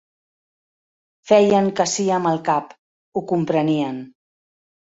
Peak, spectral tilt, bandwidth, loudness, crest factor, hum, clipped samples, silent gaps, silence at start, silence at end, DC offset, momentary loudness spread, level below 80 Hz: -2 dBFS; -5 dB/octave; 8 kHz; -19 LUFS; 20 dB; none; under 0.1%; 2.79-3.12 s; 1.25 s; 0.8 s; under 0.1%; 13 LU; -64 dBFS